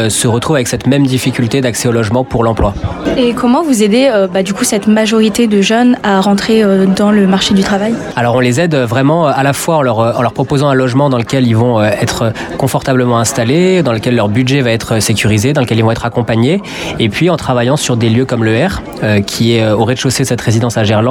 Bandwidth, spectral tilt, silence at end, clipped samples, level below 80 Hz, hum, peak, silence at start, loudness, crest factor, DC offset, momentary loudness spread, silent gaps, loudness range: 18 kHz; -5.5 dB/octave; 0 s; under 0.1%; -36 dBFS; none; 0 dBFS; 0 s; -11 LUFS; 10 dB; under 0.1%; 4 LU; none; 2 LU